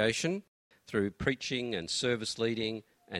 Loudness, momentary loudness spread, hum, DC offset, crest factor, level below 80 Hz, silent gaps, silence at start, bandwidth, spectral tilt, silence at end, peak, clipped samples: -33 LUFS; 6 LU; none; under 0.1%; 22 dB; -60 dBFS; 0.48-0.71 s; 0 s; 14.5 kHz; -4 dB/octave; 0 s; -12 dBFS; under 0.1%